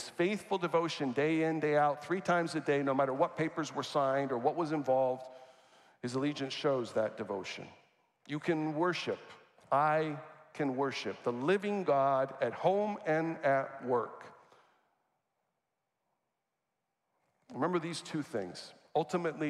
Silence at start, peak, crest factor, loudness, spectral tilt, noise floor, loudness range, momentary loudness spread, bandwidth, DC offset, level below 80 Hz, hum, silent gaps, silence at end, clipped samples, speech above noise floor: 0 s; -16 dBFS; 18 dB; -33 LUFS; -6 dB/octave; -86 dBFS; 9 LU; 10 LU; 12.5 kHz; under 0.1%; -84 dBFS; none; none; 0 s; under 0.1%; 53 dB